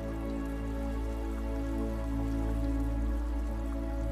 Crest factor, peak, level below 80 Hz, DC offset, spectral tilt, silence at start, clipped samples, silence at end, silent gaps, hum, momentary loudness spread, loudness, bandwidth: 12 dB; -20 dBFS; -34 dBFS; under 0.1%; -8 dB/octave; 0 s; under 0.1%; 0 s; none; none; 3 LU; -35 LUFS; 13.5 kHz